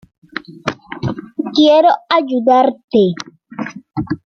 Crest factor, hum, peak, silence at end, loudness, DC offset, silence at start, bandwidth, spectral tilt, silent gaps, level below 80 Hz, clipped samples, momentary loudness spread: 14 dB; none; -2 dBFS; 0.2 s; -15 LUFS; under 0.1%; 0.35 s; 7 kHz; -6.5 dB/octave; 2.84-2.88 s; -52 dBFS; under 0.1%; 18 LU